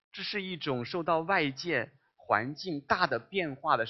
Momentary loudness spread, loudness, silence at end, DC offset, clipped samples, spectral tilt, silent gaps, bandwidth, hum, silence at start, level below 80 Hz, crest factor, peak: 7 LU; -31 LUFS; 0 s; under 0.1%; under 0.1%; -5.5 dB/octave; none; 6.4 kHz; none; 0.15 s; -66 dBFS; 22 dB; -8 dBFS